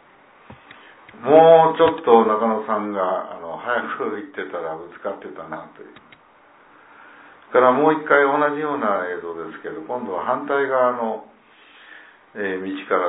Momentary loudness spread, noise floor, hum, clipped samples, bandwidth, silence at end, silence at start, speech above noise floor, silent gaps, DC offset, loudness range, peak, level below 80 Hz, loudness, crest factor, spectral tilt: 18 LU; -52 dBFS; none; under 0.1%; 4 kHz; 0 s; 0.5 s; 32 dB; none; under 0.1%; 12 LU; 0 dBFS; -66 dBFS; -19 LUFS; 20 dB; -9.5 dB/octave